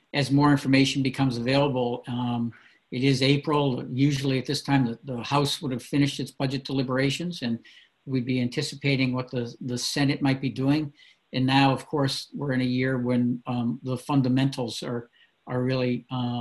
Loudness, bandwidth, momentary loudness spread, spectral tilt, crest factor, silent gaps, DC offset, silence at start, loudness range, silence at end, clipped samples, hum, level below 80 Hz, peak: -26 LUFS; 12.5 kHz; 10 LU; -6 dB/octave; 18 dB; none; under 0.1%; 0.15 s; 3 LU; 0 s; under 0.1%; none; -58 dBFS; -8 dBFS